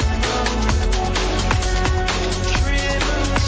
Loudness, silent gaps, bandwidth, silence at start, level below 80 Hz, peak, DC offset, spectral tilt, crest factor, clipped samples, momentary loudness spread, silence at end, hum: -20 LUFS; none; 8 kHz; 0 s; -22 dBFS; -4 dBFS; under 0.1%; -4.5 dB/octave; 14 dB; under 0.1%; 1 LU; 0 s; none